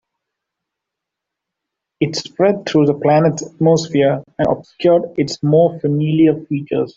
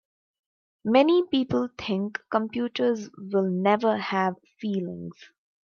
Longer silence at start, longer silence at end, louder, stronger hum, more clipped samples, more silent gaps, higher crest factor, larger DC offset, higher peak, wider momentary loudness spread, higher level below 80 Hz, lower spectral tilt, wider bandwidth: first, 2 s vs 0.85 s; second, 0.05 s vs 0.4 s; first, -16 LUFS vs -26 LUFS; neither; neither; neither; second, 14 dB vs 20 dB; neither; first, -2 dBFS vs -6 dBFS; second, 7 LU vs 12 LU; first, -54 dBFS vs -66 dBFS; about the same, -6.5 dB/octave vs -7 dB/octave; first, 7.8 kHz vs 7 kHz